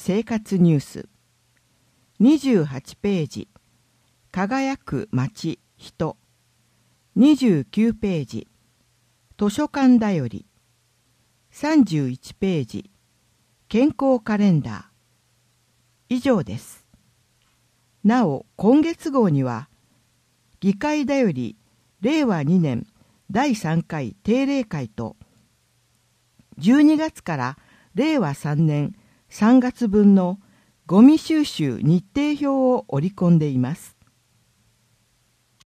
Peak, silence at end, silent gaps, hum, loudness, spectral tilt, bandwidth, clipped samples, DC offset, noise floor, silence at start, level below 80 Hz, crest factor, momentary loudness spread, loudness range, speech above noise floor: -2 dBFS; 1.8 s; none; none; -20 LUFS; -7.5 dB/octave; 14.5 kHz; under 0.1%; under 0.1%; -64 dBFS; 0 s; -56 dBFS; 18 dB; 15 LU; 7 LU; 45 dB